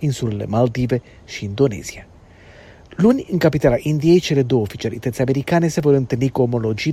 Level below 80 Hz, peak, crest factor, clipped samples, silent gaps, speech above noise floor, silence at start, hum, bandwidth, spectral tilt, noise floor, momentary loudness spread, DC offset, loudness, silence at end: -44 dBFS; 0 dBFS; 18 dB; under 0.1%; none; 26 dB; 0 s; none; 15 kHz; -7 dB/octave; -44 dBFS; 10 LU; under 0.1%; -18 LUFS; 0 s